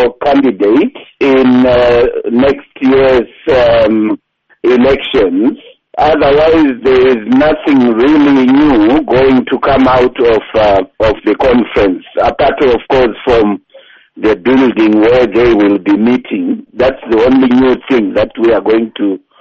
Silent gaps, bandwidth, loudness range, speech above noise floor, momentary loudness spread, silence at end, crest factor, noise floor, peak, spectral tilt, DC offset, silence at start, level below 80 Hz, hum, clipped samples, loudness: none; 6.8 kHz; 3 LU; 31 dB; 6 LU; 0.25 s; 8 dB; -40 dBFS; 0 dBFS; -7.5 dB/octave; under 0.1%; 0 s; -32 dBFS; none; under 0.1%; -9 LUFS